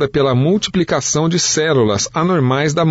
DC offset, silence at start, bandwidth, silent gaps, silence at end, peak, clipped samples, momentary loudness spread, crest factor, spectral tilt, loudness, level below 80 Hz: under 0.1%; 0 s; 8 kHz; none; 0 s; -4 dBFS; under 0.1%; 2 LU; 10 dB; -4.5 dB/octave; -15 LUFS; -44 dBFS